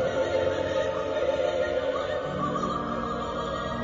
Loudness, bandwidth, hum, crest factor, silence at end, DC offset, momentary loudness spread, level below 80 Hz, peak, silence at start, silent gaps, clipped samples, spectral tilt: -28 LUFS; 7.6 kHz; none; 14 dB; 0 s; under 0.1%; 4 LU; -48 dBFS; -14 dBFS; 0 s; none; under 0.1%; -5.5 dB/octave